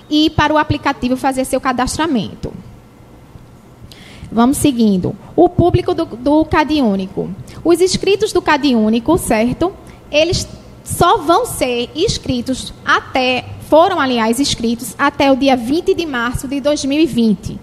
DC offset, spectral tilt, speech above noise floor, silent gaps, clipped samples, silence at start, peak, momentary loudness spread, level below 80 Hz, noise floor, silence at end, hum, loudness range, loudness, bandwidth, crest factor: under 0.1%; -4.5 dB/octave; 26 dB; none; under 0.1%; 0.1 s; 0 dBFS; 8 LU; -36 dBFS; -40 dBFS; 0 s; none; 4 LU; -15 LUFS; 14.5 kHz; 14 dB